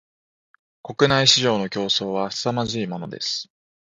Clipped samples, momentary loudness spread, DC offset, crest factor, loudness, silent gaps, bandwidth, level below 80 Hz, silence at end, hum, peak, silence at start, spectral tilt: under 0.1%; 14 LU; under 0.1%; 22 dB; -21 LUFS; none; 9.6 kHz; -58 dBFS; 0.5 s; none; 0 dBFS; 0.85 s; -3.5 dB/octave